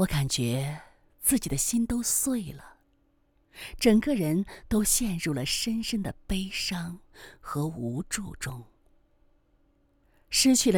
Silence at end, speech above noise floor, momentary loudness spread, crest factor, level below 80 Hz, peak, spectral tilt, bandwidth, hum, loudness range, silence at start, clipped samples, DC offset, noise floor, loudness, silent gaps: 0 s; 40 dB; 17 LU; 20 dB; -46 dBFS; -10 dBFS; -4 dB/octave; over 20 kHz; none; 8 LU; 0 s; under 0.1%; under 0.1%; -67 dBFS; -27 LUFS; none